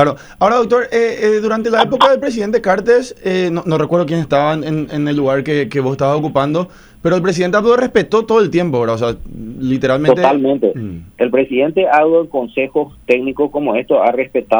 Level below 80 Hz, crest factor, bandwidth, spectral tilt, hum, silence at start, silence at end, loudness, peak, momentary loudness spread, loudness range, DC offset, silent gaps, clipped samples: -44 dBFS; 14 dB; over 20 kHz; -6.5 dB/octave; none; 0 s; 0 s; -14 LUFS; 0 dBFS; 7 LU; 2 LU; under 0.1%; none; under 0.1%